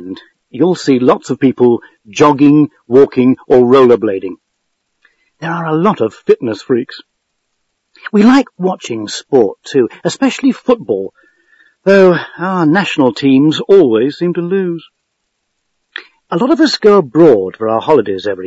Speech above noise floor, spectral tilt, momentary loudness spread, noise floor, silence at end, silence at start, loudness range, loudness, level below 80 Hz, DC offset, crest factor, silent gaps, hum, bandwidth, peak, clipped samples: 58 dB; -6.5 dB/octave; 13 LU; -69 dBFS; 0 s; 0 s; 5 LU; -11 LUFS; -56 dBFS; under 0.1%; 12 dB; none; none; 8 kHz; 0 dBFS; 0.5%